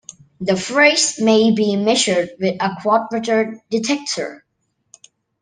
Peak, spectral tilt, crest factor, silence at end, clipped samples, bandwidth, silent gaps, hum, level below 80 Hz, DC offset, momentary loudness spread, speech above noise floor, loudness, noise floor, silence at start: 0 dBFS; -3.5 dB/octave; 18 dB; 1.05 s; under 0.1%; 10 kHz; none; none; -64 dBFS; under 0.1%; 9 LU; 53 dB; -17 LUFS; -70 dBFS; 0.4 s